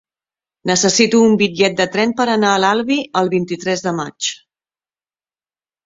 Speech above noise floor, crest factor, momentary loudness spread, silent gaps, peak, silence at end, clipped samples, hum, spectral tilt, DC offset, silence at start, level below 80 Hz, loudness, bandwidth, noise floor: over 75 dB; 16 dB; 10 LU; none; 0 dBFS; 1.5 s; under 0.1%; none; -3.5 dB/octave; under 0.1%; 0.65 s; -58 dBFS; -15 LUFS; 8 kHz; under -90 dBFS